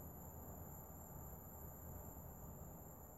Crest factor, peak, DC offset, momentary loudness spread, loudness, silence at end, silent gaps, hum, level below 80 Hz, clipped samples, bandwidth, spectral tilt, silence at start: 14 dB; -40 dBFS; under 0.1%; 1 LU; -55 LUFS; 0 s; none; none; -62 dBFS; under 0.1%; 16 kHz; -6.5 dB/octave; 0 s